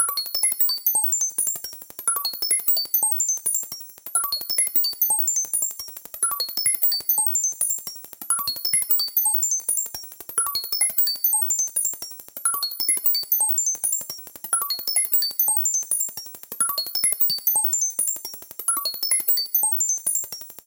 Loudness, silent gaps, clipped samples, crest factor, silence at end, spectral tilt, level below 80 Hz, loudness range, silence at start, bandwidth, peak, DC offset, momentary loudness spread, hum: -20 LUFS; none; under 0.1%; 18 dB; 0.05 s; 2.5 dB/octave; -68 dBFS; 2 LU; 0 s; 18 kHz; -6 dBFS; under 0.1%; 9 LU; none